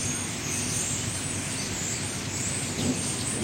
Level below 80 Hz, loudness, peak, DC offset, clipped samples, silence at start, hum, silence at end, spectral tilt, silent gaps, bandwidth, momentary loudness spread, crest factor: -50 dBFS; -28 LUFS; -16 dBFS; under 0.1%; under 0.1%; 0 s; none; 0 s; -2.5 dB/octave; none; 16.5 kHz; 3 LU; 14 dB